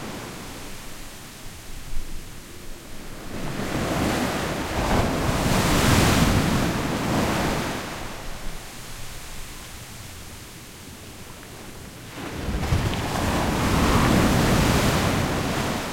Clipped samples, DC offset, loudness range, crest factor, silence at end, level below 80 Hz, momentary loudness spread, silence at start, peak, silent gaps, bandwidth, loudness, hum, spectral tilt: under 0.1%; under 0.1%; 16 LU; 18 dB; 0 s; -34 dBFS; 20 LU; 0 s; -6 dBFS; none; 16.5 kHz; -23 LUFS; none; -5 dB/octave